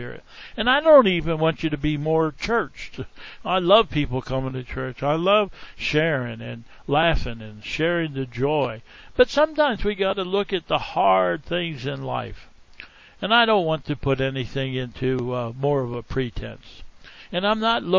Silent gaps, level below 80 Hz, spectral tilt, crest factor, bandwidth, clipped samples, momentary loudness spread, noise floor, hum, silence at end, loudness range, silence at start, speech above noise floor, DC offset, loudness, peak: none; -42 dBFS; -6.5 dB/octave; 20 dB; 7.6 kHz; under 0.1%; 16 LU; -45 dBFS; none; 0 s; 4 LU; 0 s; 23 dB; under 0.1%; -22 LUFS; -2 dBFS